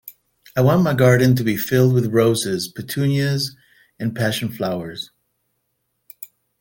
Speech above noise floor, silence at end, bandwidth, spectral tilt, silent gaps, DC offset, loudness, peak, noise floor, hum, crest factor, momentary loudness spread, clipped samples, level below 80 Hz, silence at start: 54 dB; 0.35 s; 17 kHz; -6 dB/octave; none; under 0.1%; -19 LUFS; -2 dBFS; -72 dBFS; none; 18 dB; 17 LU; under 0.1%; -54 dBFS; 0.05 s